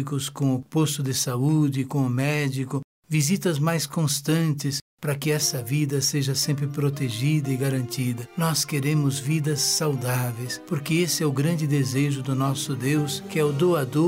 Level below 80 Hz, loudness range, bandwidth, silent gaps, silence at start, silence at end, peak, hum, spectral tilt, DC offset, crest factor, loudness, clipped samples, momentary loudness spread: -64 dBFS; 1 LU; 16 kHz; 2.84-3.03 s, 4.82-4.98 s; 0 s; 0 s; -12 dBFS; none; -5 dB/octave; under 0.1%; 12 dB; -24 LUFS; under 0.1%; 6 LU